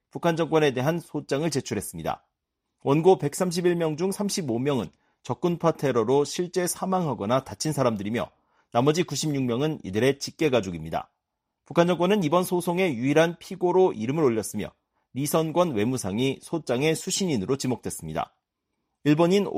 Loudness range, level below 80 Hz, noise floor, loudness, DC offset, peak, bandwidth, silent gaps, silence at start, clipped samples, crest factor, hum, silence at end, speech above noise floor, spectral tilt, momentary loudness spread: 2 LU; -60 dBFS; -82 dBFS; -25 LUFS; under 0.1%; -6 dBFS; 15.5 kHz; none; 0.15 s; under 0.1%; 20 dB; none; 0 s; 57 dB; -5.5 dB/octave; 10 LU